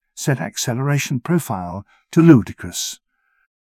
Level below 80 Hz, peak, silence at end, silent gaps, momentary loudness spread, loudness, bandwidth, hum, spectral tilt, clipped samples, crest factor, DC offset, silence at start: -48 dBFS; 0 dBFS; 0.85 s; none; 16 LU; -18 LUFS; 16 kHz; none; -5.5 dB/octave; under 0.1%; 18 dB; under 0.1%; 0.15 s